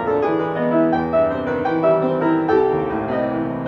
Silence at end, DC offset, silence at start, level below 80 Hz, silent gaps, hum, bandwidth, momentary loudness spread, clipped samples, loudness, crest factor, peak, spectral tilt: 0 s; under 0.1%; 0 s; -50 dBFS; none; none; 6 kHz; 4 LU; under 0.1%; -19 LUFS; 12 dB; -6 dBFS; -9 dB/octave